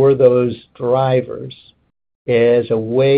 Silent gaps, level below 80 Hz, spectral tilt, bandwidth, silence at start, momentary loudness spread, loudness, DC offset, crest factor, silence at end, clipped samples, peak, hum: 2.15-2.25 s; -56 dBFS; -12 dB/octave; 4.8 kHz; 0 s; 17 LU; -15 LUFS; under 0.1%; 14 dB; 0 s; under 0.1%; 0 dBFS; none